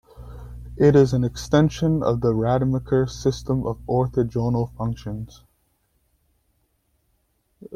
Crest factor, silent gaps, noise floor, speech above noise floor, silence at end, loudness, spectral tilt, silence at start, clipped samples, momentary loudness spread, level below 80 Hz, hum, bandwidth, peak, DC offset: 18 dB; none; -68 dBFS; 47 dB; 0 s; -22 LUFS; -7.5 dB/octave; 0.2 s; under 0.1%; 21 LU; -42 dBFS; none; 12.5 kHz; -4 dBFS; under 0.1%